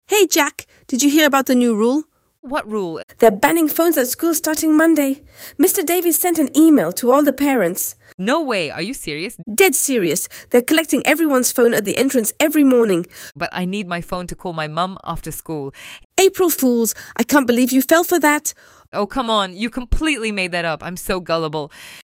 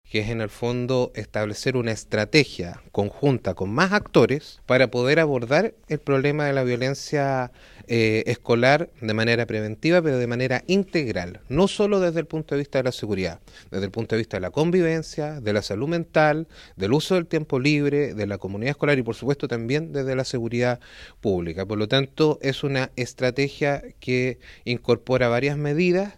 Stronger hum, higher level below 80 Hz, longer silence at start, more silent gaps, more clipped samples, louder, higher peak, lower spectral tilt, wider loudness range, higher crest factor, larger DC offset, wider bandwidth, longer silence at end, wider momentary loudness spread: neither; first, -38 dBFS vs -50 dBFS; about the same, 0.1 s vs 0.1 s; first, 2.39-2.43 s, 3.03-3.08 s, 8.14-8.18 s, 16.05-16.10 s, 18.88-18.92 s vs none; neither; first, -17 LUFS vs -23 LUFS; about the same, -2 dBFS vs -2 dBFS; second, -3.5 dB/octave vs -6 dB/octave; about the same, 5 LU vs 4 LU; second, 16 dB vs 22 dB; neither; first, 16.5 kHz vs 13.5 kHz; about the same, 0.05 s vs 0.05 s; first, 13 LU vs 9 LU